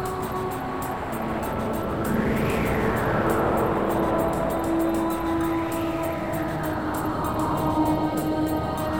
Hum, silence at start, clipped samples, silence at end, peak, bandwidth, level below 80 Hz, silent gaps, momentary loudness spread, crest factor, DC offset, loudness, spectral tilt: none; 0 s; under 0.1%; 0 s; -10 dBFS; 19.5 kHz; -40 dBFS; none; 6 LU; 16 dB; 0.4%; -25 LUFS; -6.5 dB/octave